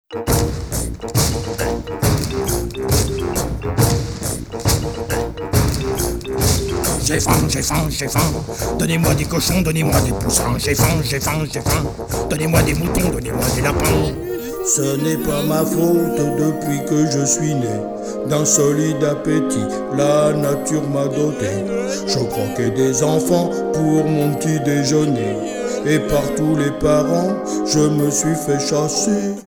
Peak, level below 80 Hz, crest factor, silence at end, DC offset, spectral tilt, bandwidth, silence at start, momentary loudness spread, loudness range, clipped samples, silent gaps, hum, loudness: 0 dBFS; -30 dBFS; 16 dB; 0.05 s; under 0.1%; -5 dB/octave; over 20 kHz; 0.1 s; 6 LU; 2 LU; under 0.1%; none; none; -18 LUFS